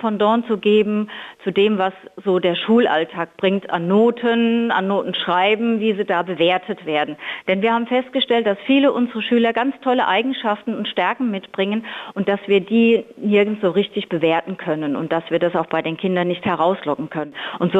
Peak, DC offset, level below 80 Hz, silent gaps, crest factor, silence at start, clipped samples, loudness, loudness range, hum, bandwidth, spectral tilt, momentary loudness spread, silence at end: -6 dBFS; under 0.1%; -66 dBFS; none; 12 dB; 0 s; under 0.1%; -19 LUFS; 2 LU; none; 7.8 kHz; -7.5 dB/octave; 8 LU; 0 s